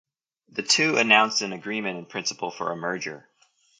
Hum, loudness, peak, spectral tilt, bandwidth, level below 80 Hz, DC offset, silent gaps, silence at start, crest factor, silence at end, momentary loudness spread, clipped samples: none; -23 LUFS; -4 dBFS; -2 dB/octave; 11 kHz; -76 dBFS; under 0.1%; none; 0.55 s; 22 dB; 0.6 s; 15 LU; under 0.1%